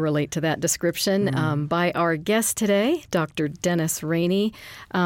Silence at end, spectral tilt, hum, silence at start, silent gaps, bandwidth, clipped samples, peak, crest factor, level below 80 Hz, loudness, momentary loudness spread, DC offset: 0 s; -4.5 dB/octave; none; 0 s; none; 17 kHz; under 0.1%; -10 dBFS; 14 dB; -58 dBFS; -23 LUFS; 5 LU; under 0.1%